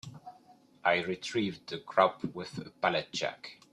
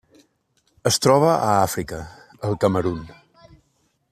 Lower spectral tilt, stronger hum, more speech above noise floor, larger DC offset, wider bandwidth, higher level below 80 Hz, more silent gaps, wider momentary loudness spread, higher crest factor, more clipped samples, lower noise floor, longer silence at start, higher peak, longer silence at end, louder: about the same, -4.5 dB/octave vs -4.5 dB/octave; neither; second, 28 dB vs 47 dB; neither; second, 12 kHz vs 14.5 kHz; second, -72 dBFS vs -52 dBFS; neither; about the same, 15 LU vs 17 LU; about the same, 24 dB vs 20 dB; neither; second, -60 dBFS vs -67 dBFS; second, 0.05 s vs 0.85 s; second, -8 dBFS vs -2 dBFS; second, 0.2 s vs 1 s; second, -32 LUFS vs -20 LUFS